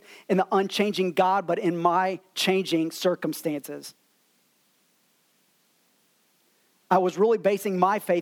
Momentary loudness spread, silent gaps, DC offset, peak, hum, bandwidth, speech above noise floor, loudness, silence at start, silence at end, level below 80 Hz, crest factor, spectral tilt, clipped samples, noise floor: 8 LU; none; under 0.1%; -6 dBFS; none; 18 kHz; 43 dB; -25 LUFS; 0.1 s; 0 s; -82 dBFS; 20 dB; -5 dB/octave; under 0.1%; -67 dBFS